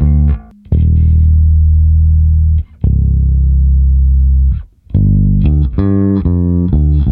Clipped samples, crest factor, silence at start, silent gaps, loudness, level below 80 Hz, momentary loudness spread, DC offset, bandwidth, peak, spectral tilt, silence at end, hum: under 0.1%; 10 dB; 0 s; none; -12 LUFS; -12 dBFS; 5 LU; under 0.1%; 1.8 kHz; 0 dBFS; -14 dB/octave; 0 s; none